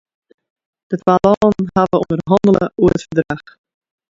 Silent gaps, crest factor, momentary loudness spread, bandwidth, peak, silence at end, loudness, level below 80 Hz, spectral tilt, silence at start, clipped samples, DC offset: 1.37-1.41 s; 16 dB; 9 LU; 7.8 kHz; 0 dBFS; 0.75 s; -15 LUFS; -44 dBFS; -8 dB/octave; 0.9 s; under 0.1%; under 0.1%